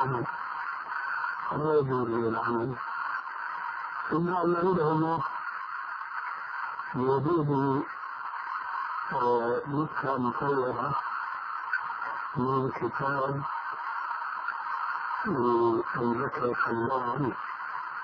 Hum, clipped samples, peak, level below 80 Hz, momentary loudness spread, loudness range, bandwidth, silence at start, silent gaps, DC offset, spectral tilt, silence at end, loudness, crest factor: none; under 0.1%; -14 dBFS; -66 dBFS; 9 LU; 2 LU; 5.4 kHz; 0 s; none; under 0.1%; -9.5 dB/octave; 0 s; -30 LUFS; 16 dB